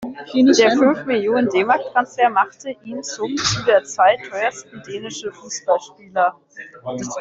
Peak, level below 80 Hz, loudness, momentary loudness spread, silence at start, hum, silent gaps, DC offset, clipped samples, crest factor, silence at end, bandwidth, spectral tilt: -2 dBFS; -56 dBFS; -18 LUFS; 16 LU; 0 s; none; none; under 0.1%; under 0.1%; 16 dB; 0 s; 7.8 kHz; -3.5 dB/octave